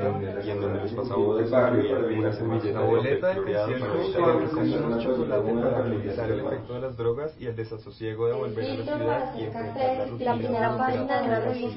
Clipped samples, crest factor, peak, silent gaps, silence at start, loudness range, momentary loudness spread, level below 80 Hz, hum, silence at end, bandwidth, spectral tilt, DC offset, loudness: under 0.1%; 18 dB; -8 dBFS; none; 0 s; 5 LU; 9 LU; -52 dBFS; none; 0 s; 5.8 kHz; -11.5 dB/octave; under 0.1%; -26 LUFS